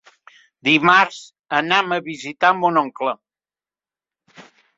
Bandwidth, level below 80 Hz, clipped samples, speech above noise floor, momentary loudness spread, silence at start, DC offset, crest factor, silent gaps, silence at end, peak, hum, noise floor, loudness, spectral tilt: 7.8 kHz; -68 dBFS; under 0.1%; over 72 dB; 13 LU; 0.65 s; under 0.1%; 20 dB; 1.39-1.44 s; 0.35 s; -2 dBFS; 50 Hz at -60 dBFS; under -90 dBFS; -18 LUFS; -4 dB/octave